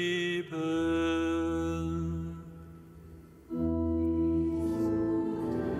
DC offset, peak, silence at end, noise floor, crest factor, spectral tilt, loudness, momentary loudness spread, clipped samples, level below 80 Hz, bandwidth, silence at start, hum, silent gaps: under 0.1%; -20 dBFS; 0 s; -51 dBFS; 12 dB; -6.5 dB/octave; -31 LUFS; 20 LU; under 0.1%; -46 dBFS; 11.5 kHz; 0 s; none; none